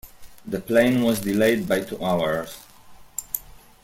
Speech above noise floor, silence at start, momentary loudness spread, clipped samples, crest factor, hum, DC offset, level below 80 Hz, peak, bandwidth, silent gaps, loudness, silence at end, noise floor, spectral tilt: 24 dB; 0.05 s; 15 LU; under 0.1%; 20 dB; none; under 0.1%; -52 dBFS; -4 dBFS; 16.5 kHz; none; -23 LUFS; 0.35 s; -46 dBFS; -5 dB/octave